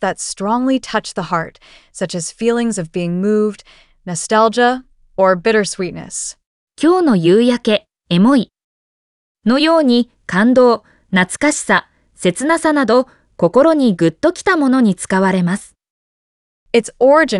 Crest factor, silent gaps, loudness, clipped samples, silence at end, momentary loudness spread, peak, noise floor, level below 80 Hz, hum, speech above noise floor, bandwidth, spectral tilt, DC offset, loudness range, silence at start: 14 dB; 6.46-6.67 s, 8.64-9.35 s, 15.90-16.66 s; -15 LUFS; under 0.1%; 0 s; 12 LU; 0 dBFS; under -90 dBFS; -52 dBFS; none; over 76 dB; 11.5 kHz; -5 dB/octave; under 0.1%; 4 LU; 0 s